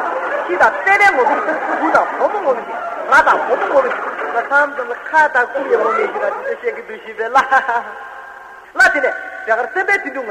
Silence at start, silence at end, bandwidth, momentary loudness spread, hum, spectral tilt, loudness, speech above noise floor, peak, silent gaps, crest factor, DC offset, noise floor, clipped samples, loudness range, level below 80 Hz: 0 s; 0 s; 16 kHz; 13 LU; none; -3 dB/octave; -15 LUFS; 20 dB; 0 dBFS; none; 16 dB; under 0.1%; -36 dBFS; under 0.1%; 3 LU; -56 dBFS